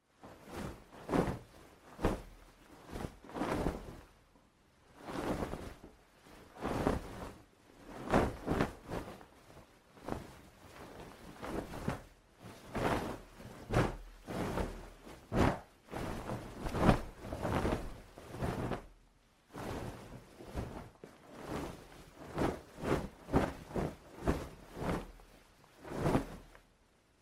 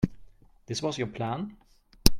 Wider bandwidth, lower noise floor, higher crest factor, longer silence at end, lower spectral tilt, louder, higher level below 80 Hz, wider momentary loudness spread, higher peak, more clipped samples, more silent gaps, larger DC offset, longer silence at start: about the same, 16 kHz vs 16.5 kHz; first, -69 dBFS vs -51 dBFS; about the same, 28 dB vs 28 dB; first, 0.6 s vs 0 s; first, -6.5 dB/octave vs -4.5 dB/octave; second, -39 LUFS vs -32 LUFS; second, -48 dBFS vs -38 dBFS; first, 21 LU vs 7 LU; second, -12 dBFS vs 0 dBFS; neither; neither; neither; first, 0.2 s vs 0 s